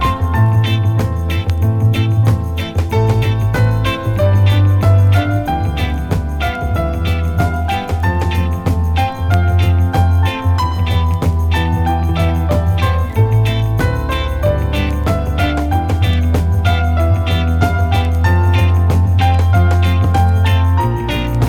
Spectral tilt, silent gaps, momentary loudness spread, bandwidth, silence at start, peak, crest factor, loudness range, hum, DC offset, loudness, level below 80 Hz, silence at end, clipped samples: -7 dB/octave; none; 5 LU; 13.5 kHz; 0 s; 0 dBFS; 12 dB; 3 LU; none; under 0.1%; -15 LUFS; -22 dBFS; 0 s; under 0.1%